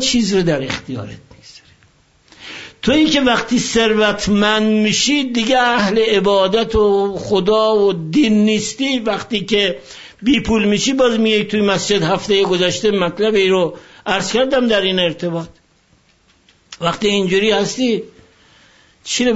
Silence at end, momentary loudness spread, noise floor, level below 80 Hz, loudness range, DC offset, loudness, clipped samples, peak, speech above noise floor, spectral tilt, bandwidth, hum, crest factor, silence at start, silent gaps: 0 s; 10 LU; -55 dBFS; -42 dBFS; 5 LU; under 0.1%; -15 LUFS; under 0.1%; -2 dBFS; 40 dB; -4 dB/octave; 8 kHz; none; 14 dB; 0 s; none